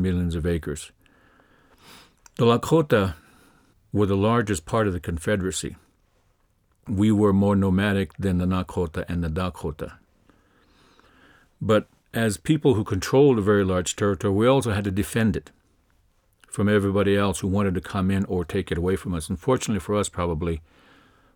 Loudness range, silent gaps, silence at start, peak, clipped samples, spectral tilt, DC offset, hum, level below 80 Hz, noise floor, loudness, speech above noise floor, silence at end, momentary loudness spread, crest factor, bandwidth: 6 LU; none; 0 s; -4 dBFS; under 0.1%; -6 dB/octave; under 0.1%; none; -44 dBFS; -65 dBFS; -23 LUFS; 43 dB; 0.75 s; 11 LU; 20 dB; 18 kHz